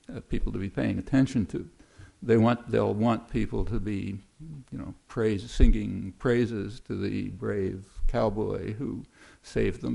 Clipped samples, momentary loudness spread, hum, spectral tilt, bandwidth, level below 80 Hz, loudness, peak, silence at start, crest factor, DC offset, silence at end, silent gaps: under 0.1%; 13 LU; none; -7.5 dB/octave; 11 kHz; -34 dBFS; -29 LUFS; -6 dBFS; 0.1 s; 22 dB; under 0.1%; 0 s; none